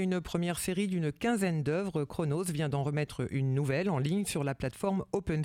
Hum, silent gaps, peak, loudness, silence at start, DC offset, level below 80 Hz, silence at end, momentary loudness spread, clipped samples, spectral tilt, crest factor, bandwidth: none; none; -16 dBFS; -32 LUFS; 0 s; under 0.1%; -56 dBFS; 0 s; 3 LU; under 0.1%; -6 dB/octave; 16 dB; 16.5 kHz